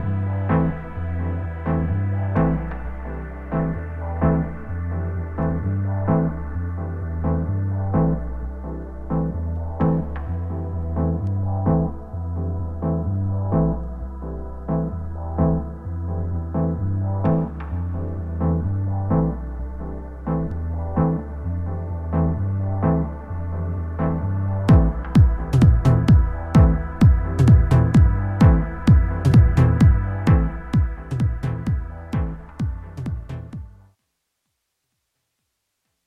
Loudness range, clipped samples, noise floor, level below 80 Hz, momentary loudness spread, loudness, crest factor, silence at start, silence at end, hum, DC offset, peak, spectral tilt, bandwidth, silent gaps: 9 LU; under 0.1%; -76 dBFS; -28 dBFS; 14 LU; -22 LUFS; 16 dB; 0 s; 2.35 s; none; under 0.1%; -4 dBFS; -9.5 dB/octave; 8.6 kHz; none